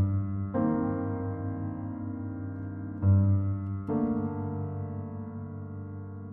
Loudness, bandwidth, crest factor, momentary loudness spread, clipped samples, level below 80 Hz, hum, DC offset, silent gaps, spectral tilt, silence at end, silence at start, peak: -32 LUFS; 2.2 kHz; 16 dB; 14 LU; under 0.1%; -56 dBFS; none; under 0.1%; none; -13 dB/octave; 0 s; 0 s; -14 dBFS